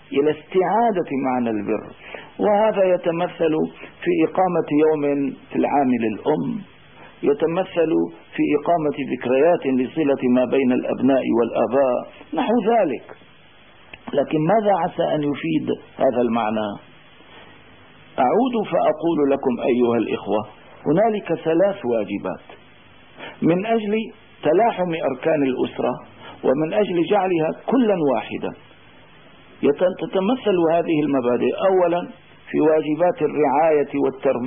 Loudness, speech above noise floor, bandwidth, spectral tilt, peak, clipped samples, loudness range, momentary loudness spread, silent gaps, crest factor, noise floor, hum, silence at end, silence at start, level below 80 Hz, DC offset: -20 LUFS; 30 dB; 3.7 kHz; -11.5 dB/octave; -8 dBFS; under 0.1%; 3 LU; 9 LU; none; 12 dB; -50 dBFS; none; 0 s; 0.1 s; -62 dBFS; 0.2%